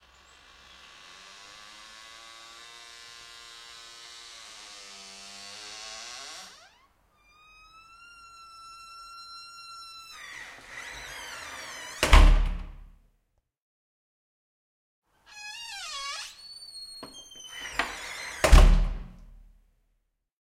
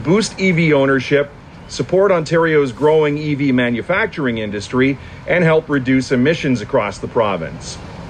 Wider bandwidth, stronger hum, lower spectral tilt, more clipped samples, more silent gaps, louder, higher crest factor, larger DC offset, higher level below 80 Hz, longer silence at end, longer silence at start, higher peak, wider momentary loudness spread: first, 13.5 kHz vs 10.5 kHz; neither; second, -4 dB/octave vs -6 dB/octave; neither; first, 13.62-15.02 s vs none; second, -29 LUFS vs -16 LUFS; first, 26 dB vs 12 dB; neither; first, -30 dBFS vs -44 dBFS; first, 1.4 s vs 0 s; first, 5.85 s vs 0 s; about the same, -4 dBFS vs -4 dBFS; first, 24 LU vs 10 LU